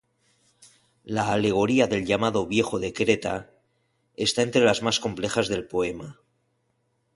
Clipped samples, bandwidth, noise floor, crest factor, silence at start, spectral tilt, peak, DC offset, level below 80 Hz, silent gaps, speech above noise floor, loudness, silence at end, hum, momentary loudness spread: under 0.1%; 11.5 kHz; -72 dBFS; 20 dB; 1.05 s; -4.5 dB/octave; -6 dBFS; under 0.1%; -54 dBFS; none; 48 dB; -24 LUFS; 1.05 s; none; 10 LU